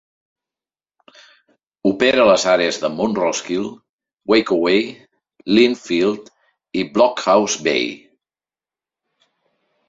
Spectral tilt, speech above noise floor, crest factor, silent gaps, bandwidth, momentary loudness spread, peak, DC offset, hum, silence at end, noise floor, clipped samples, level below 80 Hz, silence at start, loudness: -4 dB/octave; over 73 dB; 18 dB; 3.89-3.99 s; 7.8 kHz; 14 LU; 0 dBFS; under 0.1%; none; 1.95 s; under -90 dBFS; under 0.1%; -58 dBFS; 1.85 s; -17 LUFS